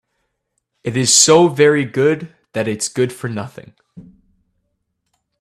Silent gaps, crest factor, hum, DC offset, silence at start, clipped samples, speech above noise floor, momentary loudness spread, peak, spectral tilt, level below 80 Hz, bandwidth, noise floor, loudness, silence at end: none; 18 dB; none; under 0.1%; 0.85 s; under 0.1%; 57 dB; 18 LU; 0 dBFS; -3.5 dB/octave; -58 dBFS; 15 kHz; -72 dBFS; -14 LUFS; 1.4 s